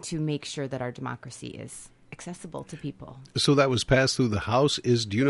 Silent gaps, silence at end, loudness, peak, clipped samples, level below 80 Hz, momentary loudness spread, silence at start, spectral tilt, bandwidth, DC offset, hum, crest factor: none; 0 s; -25 LUFS; -10 dBFS; under 0.1%; -50 dBFS; 19 LU; 0 s; -5 dB/octave; 11.5 kHz; under 0.1%; none; 18 dB